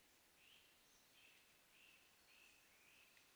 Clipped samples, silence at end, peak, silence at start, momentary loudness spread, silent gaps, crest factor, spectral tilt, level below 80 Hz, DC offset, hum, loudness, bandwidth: under 0.1%; 0 s; -54 dBFS; 0 s; 2 LU; none; 18 dB; -0.5 dB/octave; under -90 dBFS; under 0.1%; none; -68 LUFS; over 20 kHz